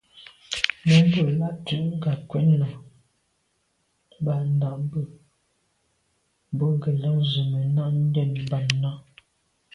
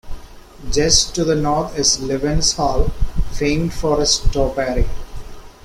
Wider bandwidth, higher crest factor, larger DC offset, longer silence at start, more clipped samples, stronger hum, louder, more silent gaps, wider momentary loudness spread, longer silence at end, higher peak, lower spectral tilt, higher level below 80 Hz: second, 10.5 kHz vs 14 kHz; first, 24 dB vs 18 dB; neither; about the same, 0.15 s vs 0.05 s; neither; neither; second, -24 LUFS vs -18 LUFS; neither; about the same, 12 LU vs 12 LU; first, 0.75 s vs 0.15 s; about the same, 0 dBFS vs 0 dBFS; first, -6.5 dB/octave vs -3.5 dB/octave; second, -60 dBFS vs -24 dBFS